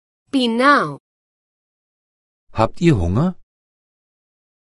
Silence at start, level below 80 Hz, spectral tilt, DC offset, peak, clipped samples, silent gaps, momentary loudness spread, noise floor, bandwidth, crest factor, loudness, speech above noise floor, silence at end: 0.35 s; -38 dBFS; -6.5 dB/octave; under 0.1%; 0 dBFS; under 0.1%; 1.00-2.47 s; 10 LU; under -90 dBFS; 11.5 kHz; 20 dB; -17 LUFS; over 74 dB; 1.35 s